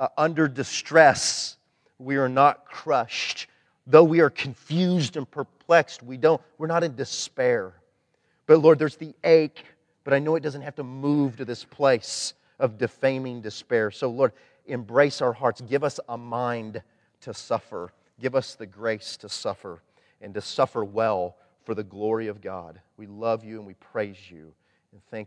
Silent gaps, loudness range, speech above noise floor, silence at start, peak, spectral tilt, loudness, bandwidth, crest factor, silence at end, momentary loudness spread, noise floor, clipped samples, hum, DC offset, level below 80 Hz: none; 10 LU; 46 dB; 0 s; 0 dBFS; -5 dB/octave; -24 LUFS; 10.5 kHz; 24 dB; 0 s; 17 LU; -70 dBFS; under 0.1%; none; under 0.1%; -72 dBFS